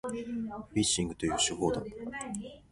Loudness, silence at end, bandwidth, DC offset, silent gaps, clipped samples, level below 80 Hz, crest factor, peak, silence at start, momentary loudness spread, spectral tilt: -32 LUFS; 0.1 s; 11.5 kHz; under 0.1%; none; under 0.1%; -54 dBFS; 18 dB; -16 dBFS; 0.05 s; 11 LU; -3.5 dB/octave